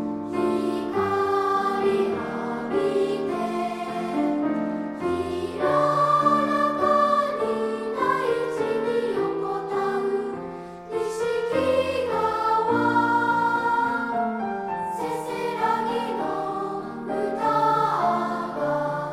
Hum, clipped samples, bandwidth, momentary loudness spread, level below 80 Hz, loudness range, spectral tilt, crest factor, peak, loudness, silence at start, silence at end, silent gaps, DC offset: none; under 0.1%; 15.5 kHz; 8 LU; -60 dBFS; 4 LU; -6 dB/octave; 16 dB; -8 dBFS; -24 LUFS; 0 s; 0 s; none; under 0.1%